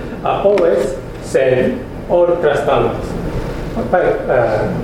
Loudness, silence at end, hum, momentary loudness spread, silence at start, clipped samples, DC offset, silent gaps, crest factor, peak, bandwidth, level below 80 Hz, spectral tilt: -16 LUFS; 0 s; none; 10 LU; 0 s; under 0.1%; under 0.1%; none; 16 dB; 0 dBFS; 13.5 kHz; -32 dBFS; -6.5 dB/octave